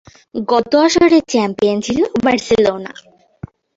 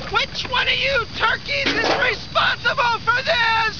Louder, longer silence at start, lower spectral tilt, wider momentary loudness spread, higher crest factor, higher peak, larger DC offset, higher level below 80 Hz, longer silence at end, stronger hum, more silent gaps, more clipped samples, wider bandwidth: first, -14 LUFS vs -18 LUFS; first, 0.35 s vs 0 s; first, -4.5 dB/octave vs -3 dB/octave; first, 14 LU vs 3 LU; about the same, 14 dB vs 14 dB; first, -2 dBFS vs -6 dBFS; second, under 0.1% vs 1%; second, -48 dBFS vs -42 dBFS; first, 0.85 s vs 0 s; neither; neither; neither; first, 8 kHz vs 5.4 kHz